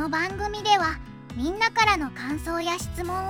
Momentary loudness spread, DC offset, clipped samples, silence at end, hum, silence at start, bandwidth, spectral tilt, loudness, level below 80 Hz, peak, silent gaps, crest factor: 10 LU; under 0.1%; under 0.1%; 0 s; none; 0 s; 17 kHz; -3.5 dB/octave; -25 LUFS; -42 dBFS; -6 dBFS; none; 20 dB